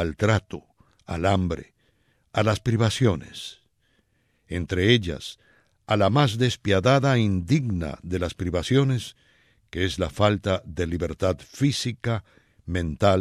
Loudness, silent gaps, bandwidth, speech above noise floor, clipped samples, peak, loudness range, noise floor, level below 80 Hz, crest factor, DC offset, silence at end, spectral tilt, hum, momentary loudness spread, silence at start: -24 LUFS; none; 13.5 kHz; 44 dB; under 0.1%; -4 dBFS; 4 LU; -68 dBFS; -46 dBFS; 20 dB; under 0.1%; 0 s; -6 dB/octave; none; 15 LU; 0 s